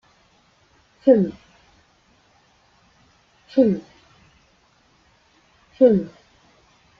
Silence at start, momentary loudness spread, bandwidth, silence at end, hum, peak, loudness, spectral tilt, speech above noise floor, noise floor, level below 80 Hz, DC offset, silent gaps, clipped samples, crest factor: 1.05 s; 11 LU; 6.8 kHz; 0.9 s; none; -2 dBFS; -19 LUFS; -9.5 dB/octave; 43 dB; -59 dBFS; -60 dBFS; under 0.1%; none; under 0.1%; 22 dB